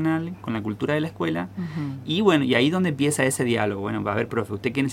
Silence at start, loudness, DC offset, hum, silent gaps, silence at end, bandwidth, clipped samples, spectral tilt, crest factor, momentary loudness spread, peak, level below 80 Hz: 0 s; -24 LUFS; under 0.1%; none; none; 0 s; 16.5 kHz; under 0.1%; -5 dB/octave; 20 dB; 10 LU; -4 dBFS; -58 dBFS